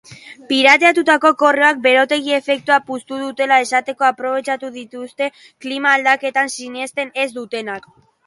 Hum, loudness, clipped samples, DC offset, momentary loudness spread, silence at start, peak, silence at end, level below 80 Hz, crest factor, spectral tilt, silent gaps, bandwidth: none; -16 LUFS; under 0.1%; under 0.1%; 14 LU; 0.1 s; 0 dBFS; 0.5 s; -70 dBFS; 16 dB; -2 dB/octave; none; 11.5 kHz